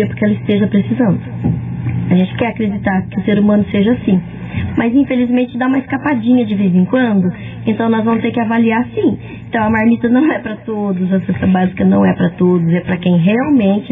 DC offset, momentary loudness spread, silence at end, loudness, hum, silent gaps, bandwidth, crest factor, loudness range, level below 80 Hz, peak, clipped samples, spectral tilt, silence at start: under 0.1%; 7 LU; 0 s; -14 LUFS; none; none; 3.8 kHz; 12 dB; 1 LU; -44 dBFS; -2 dBFS; under 0.1%; -11 dB/octave; 0 s